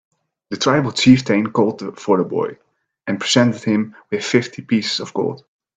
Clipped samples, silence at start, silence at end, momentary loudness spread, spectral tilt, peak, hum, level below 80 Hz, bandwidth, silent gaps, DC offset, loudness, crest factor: under 0.1%; 0.5 s; 0.4 s; 13 LU; -5 dB/octave; 0 dBFS; none; -54 dBFS; 9.2 kHz; none; under 0.1%; -18 LUFS; 18 dB